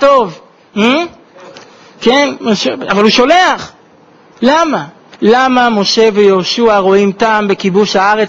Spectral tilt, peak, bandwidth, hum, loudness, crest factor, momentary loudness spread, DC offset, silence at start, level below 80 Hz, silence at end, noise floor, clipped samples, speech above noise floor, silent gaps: -4.5 dB/octave; 0 dBFS; 7.8 kHz; none; -10 LUFS; 10 dB; 8 LU; under 0.1%; 0 s; -48 dBFS; 0 s; -43 dBFS; 0.1%; 33 dB; none